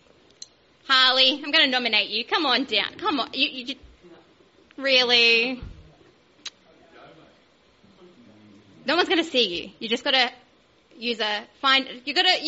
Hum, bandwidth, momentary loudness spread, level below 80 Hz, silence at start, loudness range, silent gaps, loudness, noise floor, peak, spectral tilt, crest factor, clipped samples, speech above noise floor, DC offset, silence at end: none; 8 kHz; 17 LU; -58 dBFS; 0.85 s; 7 LU; none; -21 LUFS; -59 dBFS; -4 dBFS; 1.5 dB/octave; 22 dB; under 0.1%; 36 dB; under 0.1%; 0 s